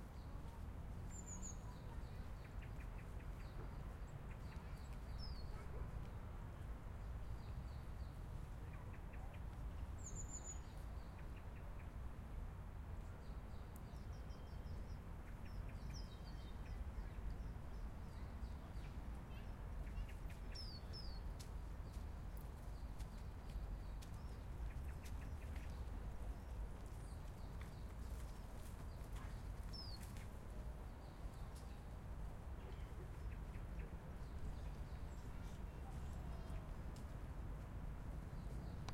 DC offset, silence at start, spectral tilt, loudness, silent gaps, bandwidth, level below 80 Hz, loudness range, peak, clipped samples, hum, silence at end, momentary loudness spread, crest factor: under 0.1%; 0 s; -5.5 dB/octave; -53 LUFS; none; 16 kHz; -52 dBFS; 1 LU; -34 dBFS; under 0.1%; none; 0 s; 3 LU; 16 dB